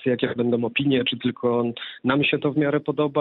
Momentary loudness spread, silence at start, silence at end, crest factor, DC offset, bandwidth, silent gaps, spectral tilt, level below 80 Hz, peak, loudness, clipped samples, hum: 4 LU; 0 s; 0 s; 16 dB; under 0.1%; 4.3 kHz; none; -10 dB/octave; -62 dBFS; -6 dBFS; -23 LUFS; under 0.1%; none